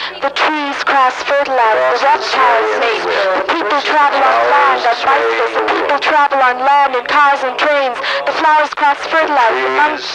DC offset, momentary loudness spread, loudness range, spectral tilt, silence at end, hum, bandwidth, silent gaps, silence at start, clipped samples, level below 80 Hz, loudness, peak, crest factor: under 0.1%; 4 LU; 1 LU; -2 dB/octave; 0 s; none; 10.5 kHz; none; 0 s; under 0.1%; -56 dBFS; -12 LUFS; -2 dBFS; 10 dB